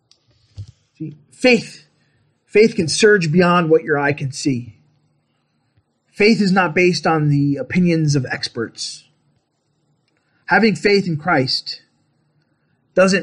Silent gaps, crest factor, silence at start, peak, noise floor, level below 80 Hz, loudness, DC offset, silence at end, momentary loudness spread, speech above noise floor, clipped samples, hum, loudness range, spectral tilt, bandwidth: none; 16 dB; 0.6 s; -2 dBFS; -67 dBFS; -56 dBFS; -16 LUFS; under 0.1%; 0 s; 16 LU; 51 dB; under 0.1%; none; 4 LU; -5.5 dB/octave; 11 kHz